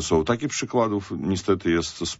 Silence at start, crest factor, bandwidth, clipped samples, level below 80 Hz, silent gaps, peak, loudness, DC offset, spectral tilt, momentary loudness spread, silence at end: 0 s; 16 dB; 8 kHz; under 0.1%; -46 dBFS; none; -8 dBFS; -24 LUFS; under 0.1%; -4.5 dB/octave; 4 LU; 0 s